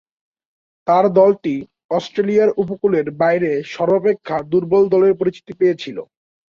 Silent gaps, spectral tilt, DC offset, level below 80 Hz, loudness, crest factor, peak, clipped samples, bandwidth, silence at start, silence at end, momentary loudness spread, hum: 1.84-1.89 s; -7.5 dB/octave; under 0.1%; -60 dBFS; -17 LUFS; 16 dB; -2 dBFS; under 0.1%; 7 kHz; 0.85 s; 0.55 s; 10 LU; none